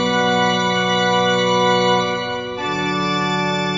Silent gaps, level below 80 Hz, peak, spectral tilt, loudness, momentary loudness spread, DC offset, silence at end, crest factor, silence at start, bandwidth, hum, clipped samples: none; -52 dBFS; -4 dBFS; -4 dB/octave; -17 LUFS; 7 LU; under 0.1%; 0 s; 14 dB; 0 s; 7.8 kHz; none; under 0.1%